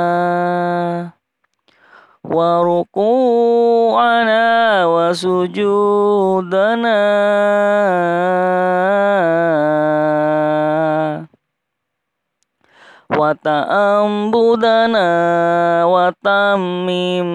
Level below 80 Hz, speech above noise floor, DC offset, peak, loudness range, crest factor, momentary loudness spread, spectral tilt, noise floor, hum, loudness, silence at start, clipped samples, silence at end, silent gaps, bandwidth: -66 dBFS; 62 dB; under 0.1%; -4 dBFS; 6 LU; 12 dB; 5 LU; -6.5 dB/octave; -76 dBFS; none; -14 LUFS; 0 s; under 0.1%; 0 s; none; 11 kHz